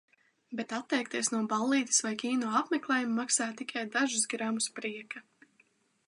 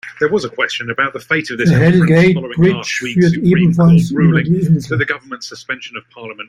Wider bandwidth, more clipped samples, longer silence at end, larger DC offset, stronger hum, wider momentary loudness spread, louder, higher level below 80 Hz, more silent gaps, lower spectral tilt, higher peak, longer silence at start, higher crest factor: first, 11.5 kHz vs 10 kHz; neither; first, 0.85 s vs 0.05 s; neither; neither; second, 11 LU vs 14 LU; second, -31 LUFS vs -13 LUFS; second, -86 dBFS vs -46 dBFS; neither; second, -2 dB/octave vs -7 dB/octave; second, -12 dBFS vs -2 dBFS; first, 0.5 s vs 0.05 s; first, 20 dB vs 12 dB